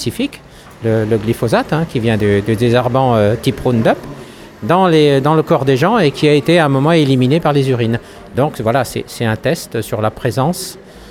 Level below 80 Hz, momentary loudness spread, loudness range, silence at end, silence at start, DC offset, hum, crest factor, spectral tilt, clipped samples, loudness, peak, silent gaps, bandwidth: -42 dBFS; 10 LU; 5 LU; 0 s; 0 s; under 0.1%; none; 14 dB; -6.5 dB/octave; under 0.1%; -14 LUFS; 0 dBFS; none; 16.5 kHz